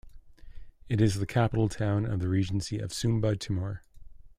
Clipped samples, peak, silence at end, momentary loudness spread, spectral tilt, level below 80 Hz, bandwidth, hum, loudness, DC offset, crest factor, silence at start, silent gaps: under 0.1%; -12 dBFS; 0.1 s; 7 LU; -6.5 dB/octave; -50 dBFS; 14 kHz; none; -29 LUFS; under 0.1%; 18 dB; 0.05 s; none